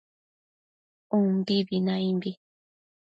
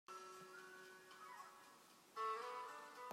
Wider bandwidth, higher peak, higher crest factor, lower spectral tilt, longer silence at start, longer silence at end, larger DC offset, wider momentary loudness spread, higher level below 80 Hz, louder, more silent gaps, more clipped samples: second, 6 kHz vs 16 kHz; first, -14 dBFS vs -34 dBFS; about the same, 16 dB vs 18 dB; first, -8.5 dB/octave vs -2 dB/octave; first, 1.1 s vs 0.1 s; first, 0.7 s vs 0 s; neither; second, 6 LU vs 15 LU; first, -72 dBFS vs under -90 dBFS; first, -27 LUFS vs -52 LUFS; neither; neither